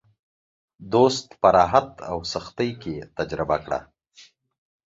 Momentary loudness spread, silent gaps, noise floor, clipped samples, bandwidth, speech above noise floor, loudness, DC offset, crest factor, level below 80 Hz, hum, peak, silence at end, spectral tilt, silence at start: 13 LU; none; -54 dBFS; under 0.1%; 8 kHz; 31 dB; -23 LUFS; under 0.1%; 22 dB; -50 dBFS; none; -2 dBFS; 1.15 s; -5 dB/octave; 0.8 s